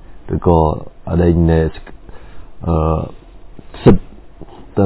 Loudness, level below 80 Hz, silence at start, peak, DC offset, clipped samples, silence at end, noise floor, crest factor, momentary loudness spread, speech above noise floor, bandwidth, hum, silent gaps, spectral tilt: -16 LUFS; -26 dBFS; 0.1 s; 0 dBFS; under 0.1%; 0.3%; 0 s; -34 dBFS; 16 dB; 13 LU; 21 dB; 4 kHz; none; none; -13 dB/octave